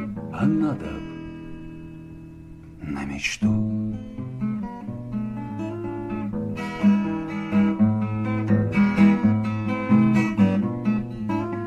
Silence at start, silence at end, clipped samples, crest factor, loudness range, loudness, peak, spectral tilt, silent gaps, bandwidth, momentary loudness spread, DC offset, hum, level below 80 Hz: 0 s; 0 s; under 0.1%; 18 dB; 8 LU; -23 LUFS; -6 dBFS; -7.5 dB/octave; none; 8.2 kHz; 19 LU; under 0.1%; none; -48 dBFS